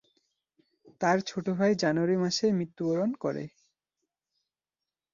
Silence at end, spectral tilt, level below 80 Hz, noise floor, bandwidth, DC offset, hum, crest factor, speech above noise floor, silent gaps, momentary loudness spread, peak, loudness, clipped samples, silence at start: 1.65 s; -5.5 dB/octave; -72 dBFS; under -90 dBFS; 7.4 kHz; under 0.1%; none; 20 dB; over 62 dB; none; 8 LU; -12 dBFS; -28 LUFS; under 0.1%; 1 s